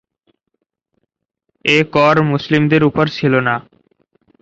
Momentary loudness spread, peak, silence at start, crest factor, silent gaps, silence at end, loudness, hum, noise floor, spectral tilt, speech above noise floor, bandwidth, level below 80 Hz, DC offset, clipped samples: 7 LU; 0 dBFS; 1.65 s; 16 dB; none; 0.8 s; -14 LUFS; none; -74 dBFS; -6.5 dB/octave; 60 dB; 7.8 kHz; -52 dBFS; under 0.1%; under 0.1%